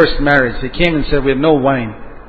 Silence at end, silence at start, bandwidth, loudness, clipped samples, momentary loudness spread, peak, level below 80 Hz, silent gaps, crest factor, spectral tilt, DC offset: 0.05 s; 0 s; 7 kHz; -14 LUFS; under 0.1%; 7 LU; 0 dBFS; -28 dBFS; none; 14 dB; -8 dB/octave; under 0.1%